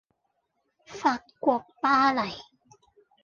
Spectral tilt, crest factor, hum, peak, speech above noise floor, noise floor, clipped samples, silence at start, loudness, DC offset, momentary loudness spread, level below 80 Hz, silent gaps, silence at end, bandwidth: -4.5 dB/octave; 20 dB; none; -10 dBFS; 51 dB; -76 dBFS; under 0.1%; 0.9 s; -26 LUFS; under 0.1%; 15 LU; -68 dBFS; none; 0.8 s; 7.4 kHz